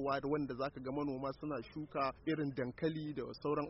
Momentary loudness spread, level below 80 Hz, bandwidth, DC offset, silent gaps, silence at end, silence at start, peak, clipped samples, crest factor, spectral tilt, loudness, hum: 6 LU; -64 dBFS; 5.8 kHz; under 0.1%; none; 0 s; 0 s; -24 dBFS; under 0.1%; 16 dB; -6 dB/octave; -40 LUFS; none